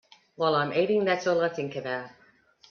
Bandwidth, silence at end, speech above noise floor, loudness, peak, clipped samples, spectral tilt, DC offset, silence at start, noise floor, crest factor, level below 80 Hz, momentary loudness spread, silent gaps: 7 kHz; 0.6 s; 33 dB; -27 LUFS; -10 dBFS; under 0.1%; -5.5 dB/octave; under 0.1%; 0.4 s; -59 dBFS; 18 dB; -72 dBFS; 10 LU; none